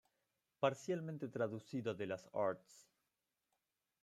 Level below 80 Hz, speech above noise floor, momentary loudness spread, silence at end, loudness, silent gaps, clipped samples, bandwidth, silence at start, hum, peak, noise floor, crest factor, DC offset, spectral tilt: -86 dBFS; 47 dB; 6 LU; 1.2 s; -42 LUFS; none; under 0.1%; 13.5 kHz; 0.6 s; none; -20 dBFS; -89 dBFS; 24 dB; under 0.1%; -6 dB/octave